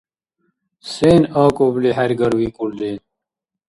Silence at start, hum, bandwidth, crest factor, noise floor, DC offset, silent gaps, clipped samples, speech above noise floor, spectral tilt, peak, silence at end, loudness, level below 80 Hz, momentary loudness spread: 0.85 s; none; 11.5 kHz; 18 dB; -84 dBFS; under 0.1%; none; under 0.1%; 68 dB; -7 dB/octave; 0 dBFS; 0.7 s; -17 LUFS; -48 dBFS; 16 LU